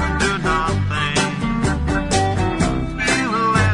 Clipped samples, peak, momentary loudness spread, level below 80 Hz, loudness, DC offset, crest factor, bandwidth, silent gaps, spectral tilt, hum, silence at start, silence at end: under 0.1%; -2 dBFS; 3 LU; -30 dBFS; -19 LUFS; under 0.1%; 16 dB; 11 kHz; none; -5 dB/octave; none; 0 s; 0 s